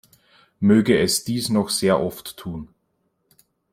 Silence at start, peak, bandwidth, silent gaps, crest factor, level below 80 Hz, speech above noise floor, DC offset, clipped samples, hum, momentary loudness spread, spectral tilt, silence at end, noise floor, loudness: 0.6 s; -4 dBFS; 16 kHz; none; 18 dB; -54 dBFS; 50 dB; under 0.1%; under 0.1%; none; 17 LU; -4.5 dB/octave; 1.1 s; -71 dBFS; -20 LUFS